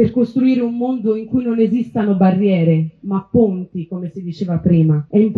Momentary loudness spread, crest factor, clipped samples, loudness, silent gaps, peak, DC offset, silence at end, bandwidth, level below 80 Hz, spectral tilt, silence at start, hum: 11 LU; 12 dB; under 0.1%; -17 LUFS; none; -2 dBFS; under 0.1%; 0 s; 5.2 kHz; -48 dBFS; -11 dB/octave; 0 s; none